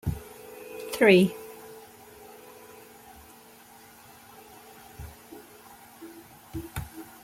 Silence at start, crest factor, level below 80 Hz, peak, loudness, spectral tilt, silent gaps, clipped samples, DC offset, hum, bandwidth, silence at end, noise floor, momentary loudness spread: 0.05 s; 24 dB; -52 dBFS; -6 dBFS; -24 LUFS; -5.5 dB/octave; none; under 0.1%; under 0.1%; none; 16.5 kHz; 0.2 s; -52 dBFS; 28 LU